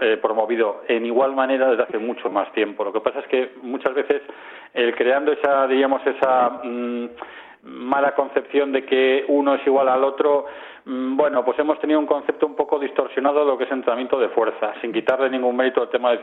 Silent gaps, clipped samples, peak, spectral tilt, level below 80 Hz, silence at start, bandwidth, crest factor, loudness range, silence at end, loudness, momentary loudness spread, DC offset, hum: none; under 0.1%; -4 dBFS; -6.5 dB/octave; -70 dBFS; 0 s; 4.1 kHz; 16 dB; 3 LU; 0 s; -21 LUFS; 9 LU; under 0.1%; none